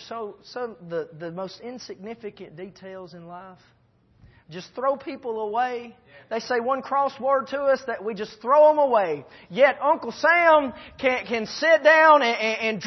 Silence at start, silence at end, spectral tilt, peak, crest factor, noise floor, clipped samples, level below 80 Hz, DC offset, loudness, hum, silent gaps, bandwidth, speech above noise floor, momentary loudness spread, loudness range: 0 s; 0 s; -4 dB/octave; -4 dBFS; 20 dB; -58 dBFS; under 0.1%; -66 dBFS; under 0.1%; -21 LUFS; none; none; 6.2 kHz; 34 dB; 23 LU; 17 LU